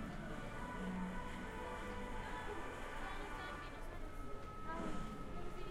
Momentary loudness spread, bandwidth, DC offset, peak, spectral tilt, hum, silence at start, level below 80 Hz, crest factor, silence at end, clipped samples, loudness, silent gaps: 6 LU; 14 kHz; under 0.1%; -30 dBFS; -5.5 dB/octave; none; 0 s; -50 dBFS; 14 dB; 0 s; under 0.1%; -48 LUFS; none